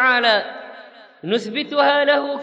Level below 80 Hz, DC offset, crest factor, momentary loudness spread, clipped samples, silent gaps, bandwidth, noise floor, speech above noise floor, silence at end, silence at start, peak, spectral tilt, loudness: -76 dBFS; under 0.1%; 16 dB; 20 LU; under 0.1%; none; 8 kHz; -42 dBFS; 24 dB; 0 s; 0 s; -2 dBFS; -4 dB/octave; -18 LUFS